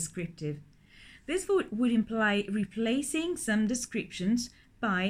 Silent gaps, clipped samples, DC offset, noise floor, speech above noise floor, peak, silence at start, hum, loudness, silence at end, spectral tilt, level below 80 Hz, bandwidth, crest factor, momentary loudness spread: none; under 0.1%; under 0.1%; -55 dBFS; 25 dB; -16 dBFS; 0 s; none; -31 LUFS; 0 s; -4.5 dB/octave; -58 dBFS; 15.5 kHz; 14 dB; 10 LU